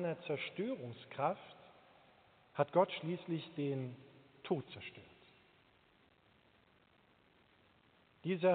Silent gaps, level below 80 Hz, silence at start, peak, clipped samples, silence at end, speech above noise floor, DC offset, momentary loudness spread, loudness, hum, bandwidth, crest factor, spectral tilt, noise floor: none; -84 dBFS; 0 s; -18 dBFS; under 0.1%; 0 s; 32 dB; under 0.1%; 24 LU; -40 LUFS; none; 4.5 kHz; 24 dB; -5 dB/octave; -70 dBFS